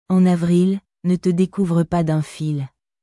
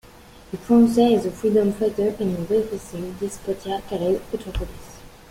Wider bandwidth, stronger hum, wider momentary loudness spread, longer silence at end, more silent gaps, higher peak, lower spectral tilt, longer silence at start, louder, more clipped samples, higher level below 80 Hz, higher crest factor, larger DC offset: second, 11.5 kHz vs 16 kHz; neither; second, 9 LU vs 16 LU; first, 0.35 s vs 0.2 s; neither; about the same, -6 dBFS vs -6 dBFS; first, -8.5 dB/octave vs -6.5 dB/octave; second, 0.1 s vs 0.5 s; first, -19 LUFS vs -22 LUFS; neither; second, -52 dBFS vs -42 dBFS; about the same, 12 dB vs 16 dB; neither